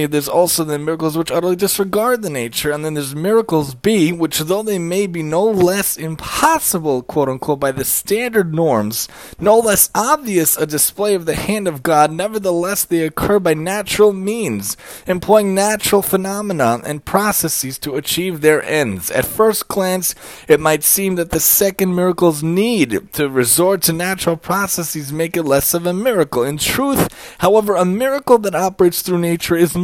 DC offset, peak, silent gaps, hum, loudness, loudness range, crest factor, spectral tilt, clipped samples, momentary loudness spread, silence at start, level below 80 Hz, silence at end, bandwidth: under 0.1%; 0 dBFS; none; none; -16 LUFS; 3 LU; 16 dB; -4 dB/octave; under 0.1%; 7 LU; 0 s; -44 dBFS; 0 s; 17 kHz